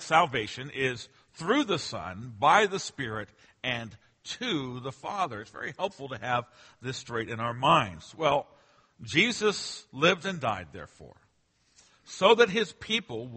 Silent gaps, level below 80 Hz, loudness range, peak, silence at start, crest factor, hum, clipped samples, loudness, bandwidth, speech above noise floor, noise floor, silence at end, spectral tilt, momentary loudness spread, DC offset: none; -64 dBFS; 7 LU; -6 dBFS; 0 s; 24 dB; none; under 0.1%; -28 LUFS; 8.8 kHz; 41 dB; -70 dBFS; 0 s; -4 dB/octave; 17 LU; under 0.1%